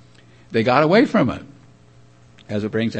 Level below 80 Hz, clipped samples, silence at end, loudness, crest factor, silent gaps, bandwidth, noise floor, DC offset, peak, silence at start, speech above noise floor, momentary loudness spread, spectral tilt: -54 dBFS; under 0.1%; 0 s; -18 LUFS; 18 dB; none; 8.6 kHz; -50 dBFS; 0.1%; -2 dBFS; 0.5 s; 32 dB; 13 LU; -7 dB/octave